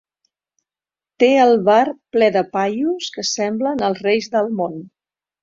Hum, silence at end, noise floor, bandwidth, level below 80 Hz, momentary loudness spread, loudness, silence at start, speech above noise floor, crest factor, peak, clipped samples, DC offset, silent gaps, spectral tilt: none; 0.55 s; under -90 dBFS; 7.6 kHz; -64 dBFS; 9 LU; -17 LUFS; 1.2 s; over 73 dB; 16 dB; -2 dBFS; under 0.1%; under 0.1%; none; -4 dB/octave